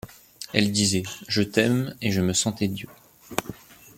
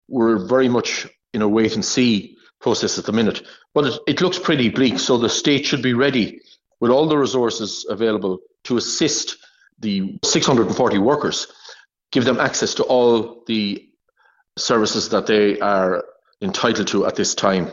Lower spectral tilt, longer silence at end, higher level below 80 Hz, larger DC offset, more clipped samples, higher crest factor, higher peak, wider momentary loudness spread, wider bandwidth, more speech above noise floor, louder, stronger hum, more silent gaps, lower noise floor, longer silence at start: about the same, -4 dB/octave vs -4 dB/octave; first, 0.4 s vs 0 s; about the same, -58 dBFS vs -56 dBFS; neither; neither; first, 24 dB vs 18 dB; about the same, -2 dBFS vs 0 dBFS; first, 18 LU vs 9 LU; first, 17 kHz vs 8 kHz; second, 20 dB vs 42 dB; second, -24 LUFS vs -19 LUFS; neither; neither; second, -43 dBFS vs -60 dBFS; about the same, 0.05 s vs 0.1 s